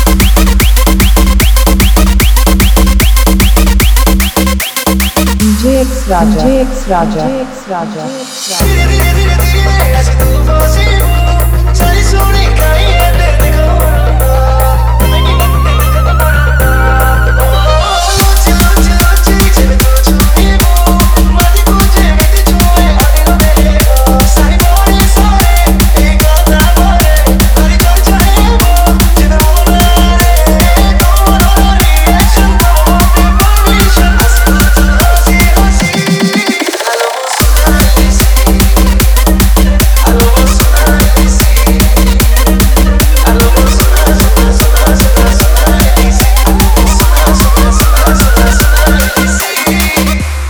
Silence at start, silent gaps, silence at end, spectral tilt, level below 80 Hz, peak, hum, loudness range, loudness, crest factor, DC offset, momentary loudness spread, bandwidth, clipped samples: 0 s; none; 0 s; -4.5 dB/octave; -8 dBFS; 0 dBFS; none; 2 LU; -8 LUFS; 6 dB; under 0.1%; 2 LU; over 20 kHz; 0.4%